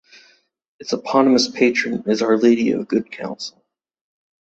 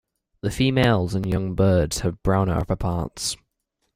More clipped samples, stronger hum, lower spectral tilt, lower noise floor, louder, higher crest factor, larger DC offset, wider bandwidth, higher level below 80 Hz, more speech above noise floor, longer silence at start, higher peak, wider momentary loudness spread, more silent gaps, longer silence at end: neither; neither; about the same, -4.5 dB/octave vs -5.5 dB/octave; second, -57 dBFS vs -75 dBFS; first, -18 LUFS vs -23 LUFS; about the same, 18 dB vs 18 dB; neither; second, 8 kHz vs 16 kHz; second, -64 dBFS vs -38 dBFS; second, 39 dB vs 54 dB; first, 0.8 s vs 0.45 s; about the same, -2 dBFS vs -4 dBFS; first, 15 LU vs 8 LU; neither; first, 0.9 s vs 0.6 s